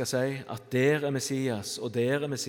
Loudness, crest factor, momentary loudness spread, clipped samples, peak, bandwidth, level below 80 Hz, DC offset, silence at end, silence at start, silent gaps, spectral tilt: -29 LUFS; 16 dB; 7 LU; under 0.1%; -12 dBFS; 18 kHz; -74 dBFS; under 0.1%; 0 s; 0 s; none; -5 dB/octave